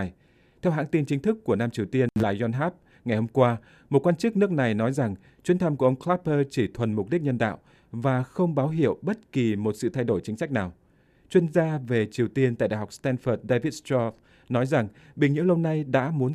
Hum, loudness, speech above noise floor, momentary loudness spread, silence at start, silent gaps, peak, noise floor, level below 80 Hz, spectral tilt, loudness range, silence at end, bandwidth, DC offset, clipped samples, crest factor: none; -26 LUFS; 36 dB; 6 LU; 0 s; none; -6 dBFS; -60 dBFS; -58 dBFS; -7.5 dB/octave; 2 LU; 0 s; 13 kHz; under 0.1%; under 0.1%; 18 dB